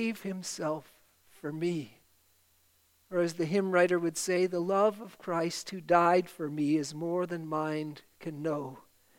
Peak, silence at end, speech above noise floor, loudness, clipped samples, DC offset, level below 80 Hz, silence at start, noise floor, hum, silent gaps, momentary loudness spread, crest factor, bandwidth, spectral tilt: -10 dBFS; 0.4 s; 37 dB; -31 LUFS; under 0.1%; under 0.1%; -78 dBFS; 0 s; -68 dBFS; none; none; 14 LU; 22 dB; 16.5 kHz; -5 dB/octave